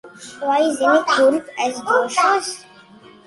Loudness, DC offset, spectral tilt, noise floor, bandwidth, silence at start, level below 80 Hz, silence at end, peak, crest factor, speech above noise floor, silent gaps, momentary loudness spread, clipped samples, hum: -18 LUFS; under 0.1%; -2 dB/octave; -45 dBFS; 11.5 kHz; 0.05 s; -68 dBFS; 0.65 s; -2 dBFS; 16 dB; 27 dB; none; 13 LU; under 0.1%; none